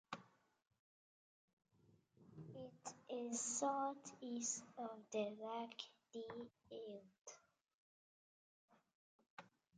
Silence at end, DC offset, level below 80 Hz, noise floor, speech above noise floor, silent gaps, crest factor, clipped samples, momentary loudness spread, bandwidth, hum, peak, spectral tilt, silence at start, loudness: 0.3 s; under 0.1%; under -90 dBFS; -76 dBFS; 28 dB; 0.79-1.57 s, 7.21-7.25 s, 7.74-8.68 s, 8.94-9.19 s, 9.30-9.37 s; 22 dB; under 0.1%; 19 LU; 9.4 kHz; none; -30 dBFS; -3 dB/octave; 0.1 s; -48 LUFS